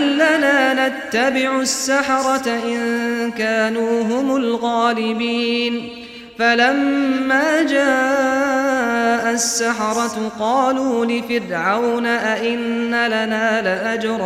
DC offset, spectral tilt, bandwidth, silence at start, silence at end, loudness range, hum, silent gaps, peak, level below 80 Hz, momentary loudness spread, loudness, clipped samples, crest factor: under 0.1%; -3 dB/octave; 15.5 kHz; 0 s; 0 s; 2 LU; none; none; -4 dBFS; -58 dBFS; 6 LU; -18 LUFS; under 0.1%; 14 dB